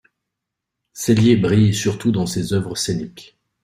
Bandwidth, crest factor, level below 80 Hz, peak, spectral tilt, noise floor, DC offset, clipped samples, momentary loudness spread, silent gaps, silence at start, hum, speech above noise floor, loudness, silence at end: 16 kHz; 18 dB; -50 dBFS; -2 dBFS; -6 dB/octave; -81 dBFS; under 0.1%; under 0.1%; 10 LU; none; 0.95 s; none; 64 dB; -18 LUFS; 0.4 s